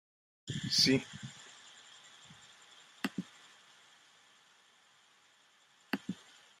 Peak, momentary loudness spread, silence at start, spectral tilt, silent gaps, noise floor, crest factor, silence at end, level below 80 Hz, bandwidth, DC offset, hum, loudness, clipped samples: -12 dBFS; 28 LU; 0.45 s; -3.5 dB/octave; none; -67 dBFS; 28 dB; 0.45 s; -76 dBFS; 13.5 kHz; under 0.1%; none; -34 LUFS; under 0.1%